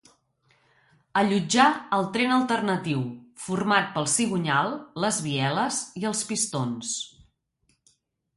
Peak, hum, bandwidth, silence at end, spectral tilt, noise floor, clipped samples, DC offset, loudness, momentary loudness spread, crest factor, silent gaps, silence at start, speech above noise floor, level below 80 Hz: -6 dBFS; none; 11.5 kHz; 1.3 s; -3.5 dB/octave; -71 dBFS; under 0.1%; under 0.1%; -25 LUFS; 9 LU; 20 dB; none; 1.15 s; 46 dB; -66 dBFS